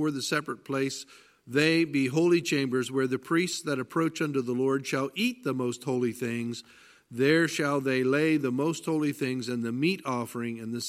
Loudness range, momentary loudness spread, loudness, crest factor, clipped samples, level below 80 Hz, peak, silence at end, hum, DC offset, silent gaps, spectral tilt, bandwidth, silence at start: 3 LU; 9 LU; -28 LUFS; 20 dB; under 0.1%; -74 dBFS; -8 dBFS; 0 s; none; under 0.1%; none; -5 dB/octave; 15.5 kHz; 0 s